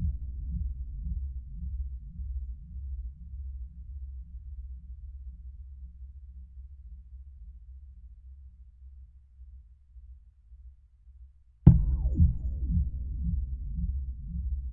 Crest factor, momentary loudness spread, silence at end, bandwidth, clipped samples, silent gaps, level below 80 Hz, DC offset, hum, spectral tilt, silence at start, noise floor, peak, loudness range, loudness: 30 dB; 26 LU; 0 s; 1.6 kHz; under 0.1%; none; -36 dBFS; under 0.1%; none; -13.5 dB/octave; 0 s; -55 dBFS; -2 dBFS; 24 LU; -32 LUFS